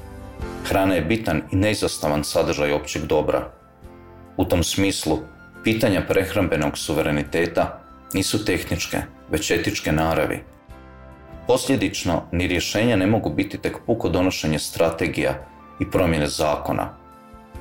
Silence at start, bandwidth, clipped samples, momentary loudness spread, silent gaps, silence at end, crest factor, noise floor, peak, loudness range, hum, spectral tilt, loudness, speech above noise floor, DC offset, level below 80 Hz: 0 s; 17 kHz; under 0.1%; 9 LU; none; 0 s; 14 dB; -45 dBFS; -8 dBFS; 2 LU; none; -5 dB/octave; -22 LUFS; 23 dB; 0.2%; -40 dBFS